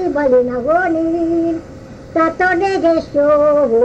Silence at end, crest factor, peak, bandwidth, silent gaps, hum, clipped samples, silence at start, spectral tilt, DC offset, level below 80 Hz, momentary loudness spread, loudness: 0 s; 12 dB; -4 dBFS; 8.2 kHz; none; none; under 0.1%; 0 s; -6.5 dB/octave; under 0.1%; -42 dBFS; 9 LU; -15 LUFS